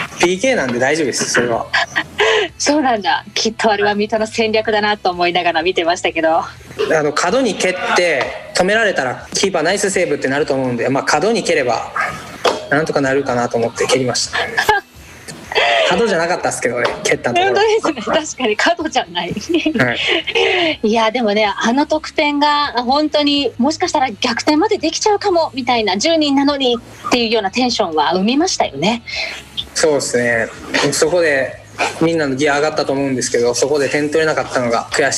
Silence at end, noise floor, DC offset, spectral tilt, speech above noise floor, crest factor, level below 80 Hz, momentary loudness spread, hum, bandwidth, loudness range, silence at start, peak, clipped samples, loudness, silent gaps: 0 s; -37 dBFS; under 0.1%; -3 dB/octave; 21 dB; 14 dB; -48 dBFS; 5 LU; none; 14.5 kHz; 2 LU; 0 s; -2 dBFS; under 0.1%; -15 LUFS; none